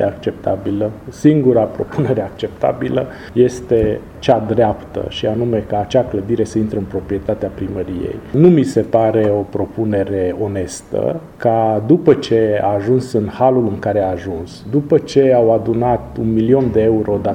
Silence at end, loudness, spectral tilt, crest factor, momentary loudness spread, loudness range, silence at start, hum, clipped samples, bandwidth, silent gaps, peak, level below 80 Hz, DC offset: 0 s; -16 LUFS; -7.5 dB/octave; 16 dB; 10 LU; 2 LU; 0 s; none; under 0.1%; 11 kHz; none; 0 dBFS; -40 dBFS; under 0.1%